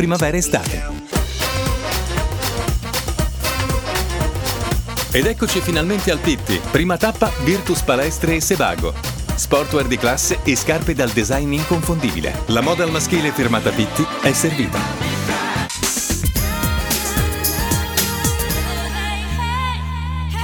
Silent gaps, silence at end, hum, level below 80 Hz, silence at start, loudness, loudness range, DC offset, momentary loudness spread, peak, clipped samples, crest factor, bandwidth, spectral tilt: none; 0 s; none; -26 dBFS; 0 s; -19 LUFS; 3 LU; under 0.1%; 5 LU; 0 dBFS; under 0.1%; 18 dB; over 20 kHz; -4 dB/octave